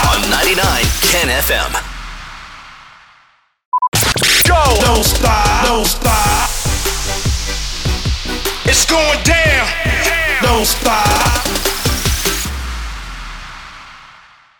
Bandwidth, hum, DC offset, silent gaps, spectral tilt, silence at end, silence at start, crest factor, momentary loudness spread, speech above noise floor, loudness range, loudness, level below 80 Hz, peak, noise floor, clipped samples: over 20 kHz; none; under 0.1%; 3.65-3.72 s, 3.88-3.92 s; -2.5 dB/octave; 0.55 s; 0 s; 14 dB; 18 LU; 39 dB; 5 LU; -13 LUFS; -22 dBFS; -2 dBFS; -52 dBFS; under 0.1%